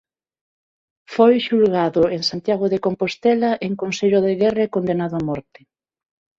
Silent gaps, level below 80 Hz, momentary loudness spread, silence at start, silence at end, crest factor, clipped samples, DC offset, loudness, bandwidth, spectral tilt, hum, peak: none; -58 dBFS; 8 LU; 1.1 s; 0.95 s; 16 dB; under 0.1%; under 0.1%; -19 LUFS; 7.8 kHz; -6 dB/octave; none; -4 dBFS